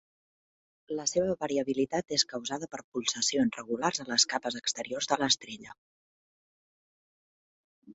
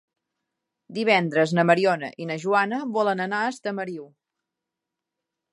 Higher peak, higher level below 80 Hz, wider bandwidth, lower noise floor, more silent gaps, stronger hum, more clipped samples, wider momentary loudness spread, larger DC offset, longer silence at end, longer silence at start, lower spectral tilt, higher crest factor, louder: second, -10 dBFS vs -4 dBFS; first, -70 dBFS vs -78 dBFS; second, 8.4 kHz vs 11.5 kHz; first, under -90 dBFS vs -85 dBFS; first, 2.84-2.92 s, 5.78-7.82 s vs none; neither; neither; about the same, 10 LU vs 12 LU; neither; second, 0 s vs 1.45 s; about the same, 0.9 s vs 0.9 s; second, -2 dB/octave vs -6 dB/octave; about the same, 24 dB vs 22 dB; second, -30 LUFS vs -23 LUFS